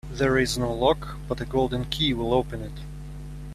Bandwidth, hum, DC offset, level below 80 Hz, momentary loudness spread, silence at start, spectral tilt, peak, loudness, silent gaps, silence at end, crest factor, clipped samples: 14 kHz; 50 Hz at -35 dBFS; under 0.1%; -38 dBFS; 17 LU; 0.05 s; -5 dB/octave; -6 dBFS; -25 LUFS; none; 0 s; 20 dB; under 0.1%